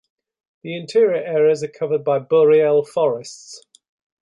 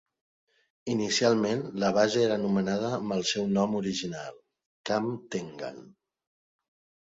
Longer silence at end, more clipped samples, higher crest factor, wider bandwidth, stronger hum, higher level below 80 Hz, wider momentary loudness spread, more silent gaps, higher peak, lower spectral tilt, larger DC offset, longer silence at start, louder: second, 0.7 s vs 1.1 s; neither; second, 14 dB vs 20 dB; first, 11.5 kHz vs 7.8 kHz; neither; about the same, -70 dBFS vs -66 dBFS; first, 21 LU vs 16 LU; second, none vs 4.66-4.84 s; first, -6 dBFS vs -10 dBFS; about the same, -5.5 dB/octave vs -4.5 dB/octave; neither; second, 0.65 s vs 0.85 s; first, -18 LUFS vs -28 LUFS